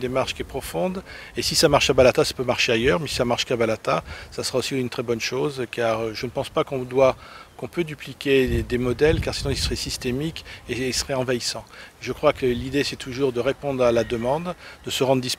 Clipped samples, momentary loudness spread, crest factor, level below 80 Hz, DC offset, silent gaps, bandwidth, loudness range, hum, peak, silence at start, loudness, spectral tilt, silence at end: under 0.1%; 12 LU; 22 dB; -40 dBFS; under 0.1%; none; 16 kHz; 5 LU; none; -2 dBFS; 0 s; -23 LUFS; -4 dB/octave; 0.05 s